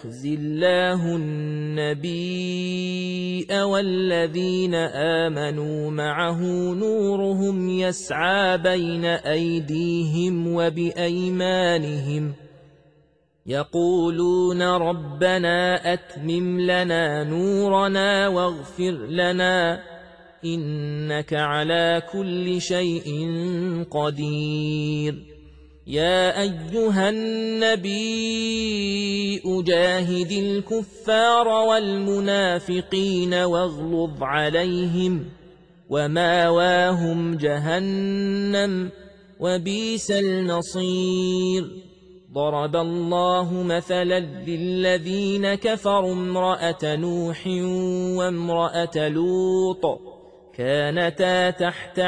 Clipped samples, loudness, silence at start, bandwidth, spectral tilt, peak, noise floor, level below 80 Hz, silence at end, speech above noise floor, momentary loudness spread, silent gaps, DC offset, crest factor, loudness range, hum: under 0.1%; -22 LUFS; 0 s; 10.5 kHz; -5.5 dB/octave; -6 dBFS; -60 dBFS; -56 dBFS; 0 s; 38 dB; 7 LU; none; under 0.1%; 16 dB; 3 LU; none